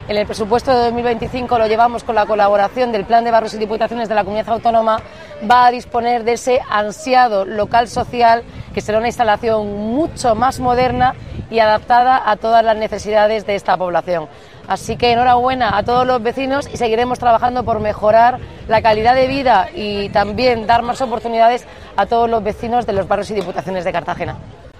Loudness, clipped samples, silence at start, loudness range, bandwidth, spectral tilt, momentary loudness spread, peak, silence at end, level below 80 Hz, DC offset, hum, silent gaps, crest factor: -15 LUFS; under 0.1%; 0 s; 2 LU; 12.5 kHz; -5 dB/octave; 9 LU; 0 dBFS; 0.1 s; -40 dBFS; 0.4%; none; none; 16 dB